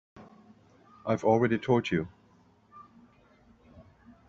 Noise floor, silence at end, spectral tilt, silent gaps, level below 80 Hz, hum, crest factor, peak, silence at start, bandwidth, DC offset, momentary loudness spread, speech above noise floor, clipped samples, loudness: -62 dBFS; 0.45 s; -6 dB/octave; none; -64 dBFS; none; 22 dB; -10 dBFS; 0.15 s; 7.6 kHz; under 0.1%; 13 LU; 36 dB; under 0.1%; -28 LUFS